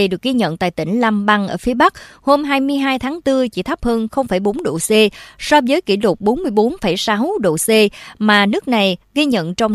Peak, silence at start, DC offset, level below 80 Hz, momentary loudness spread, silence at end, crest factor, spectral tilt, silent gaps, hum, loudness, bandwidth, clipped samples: 0 dBFS; 0 s; under 0.1%; -42 dBFS; 6 LU; 0 s; 16 dB; -4.5 dB/octave; none; none; -16 LUFS; 14.5 kHz; under 0.1%